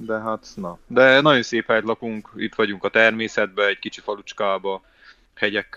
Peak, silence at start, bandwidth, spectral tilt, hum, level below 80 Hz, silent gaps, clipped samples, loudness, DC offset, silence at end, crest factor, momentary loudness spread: -2 dBFS; 0 s; 7.8 kHz; -4.5 dB/octave; none; -60 dBFS; none; under 0.1%; -20 LUFS; under 0.1%; 0.15 s; 20 dB; 16 LU